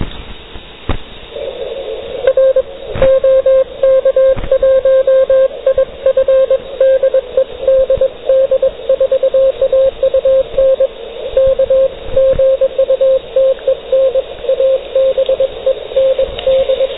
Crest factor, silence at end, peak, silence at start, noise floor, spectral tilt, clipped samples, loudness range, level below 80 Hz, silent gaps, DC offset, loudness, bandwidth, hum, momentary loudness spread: 10 dB; 0 s; 0 dBFS; 0 s; -31 dBFS; -9 dB/octave; under 0.1%; 3 LU; -32 dBFS; none; 0.8%; -12 LUFS; 4 kHz; none; 13 LU